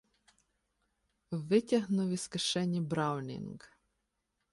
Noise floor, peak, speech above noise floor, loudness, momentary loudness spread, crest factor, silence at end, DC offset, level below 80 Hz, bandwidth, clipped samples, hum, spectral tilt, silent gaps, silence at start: -83 dBFS; -16 dBFS; 50 dB; -33 LUFS; 14 LU; 20 dB; 0.85 s; under 0.1%; -72 dBFS; 11.5 kHz; under 0.1%; none; -5.5 dB/octave; none; 1.3 s